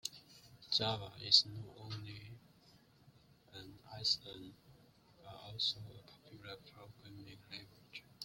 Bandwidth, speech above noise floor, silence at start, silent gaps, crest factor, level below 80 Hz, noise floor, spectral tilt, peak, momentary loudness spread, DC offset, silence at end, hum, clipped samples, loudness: 16.5 kHz; 26 dB; 0.05 s; none; 30 dB; -72 dBFS; -67 dBFS; -2.5 dB/octave; -12 dBFS; 27 LU; under 0.1%; 0 s; none; under 0.1%; -35 LUFS